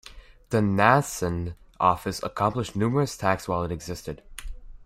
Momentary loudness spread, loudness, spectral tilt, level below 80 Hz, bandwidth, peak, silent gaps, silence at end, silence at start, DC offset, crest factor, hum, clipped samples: 18 LU; -25 LUFS; -5.5 dB/octave; -46 dBFS; 16 kHz; -4 dBFS; none; 0 s; 0.05 s; under 0.1%; 22 dB; none; under 0.1%